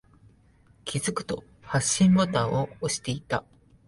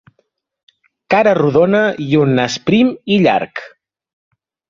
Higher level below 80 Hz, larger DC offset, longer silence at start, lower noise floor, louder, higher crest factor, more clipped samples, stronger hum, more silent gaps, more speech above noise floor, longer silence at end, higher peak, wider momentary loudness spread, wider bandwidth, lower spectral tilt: about the same, -54 dBFS vs -54 dBFS; neither; second, 0.85 s vs 1.1 s; second, -59 dBFS vs -65 dBFS; second, -26 LUFS vs -13 LUFS; about the same, 18 dB vs 14 dB; neither; neither; neither; second, 33 dB vs 52 dB; second, 0.45 s vs 1 s; second, -10 dBFS vs -2 dBFS; first, 13 LU vs 5 LU; first, 11.5 kHz vs 7.4 kHz; second, -4.5 dB/octave vs -6 dB/octave